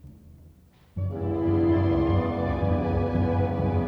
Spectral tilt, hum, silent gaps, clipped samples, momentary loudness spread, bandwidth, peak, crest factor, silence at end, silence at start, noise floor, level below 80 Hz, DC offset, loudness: -10.5 dB/octave; none; none; under 0.1%; 8 LU; 5.2 kHz; -12 dBFS; 12 dB; 0 s; 0.05 s; -54 dBFS; -38 dBFS; under 0.1%; -25 LUFS